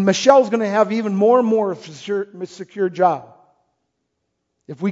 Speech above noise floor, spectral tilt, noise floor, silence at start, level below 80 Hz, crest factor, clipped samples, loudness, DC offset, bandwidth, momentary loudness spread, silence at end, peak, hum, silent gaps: 57 dB; -5.5 dB/octave; -74 dBFS; 0 s; -70 dBFS; 18 dB; under 0.1%; -18 LUFS; under 0.1%; 7.8 kHz; 18 LU; 0 s; 0 dBFS; none; none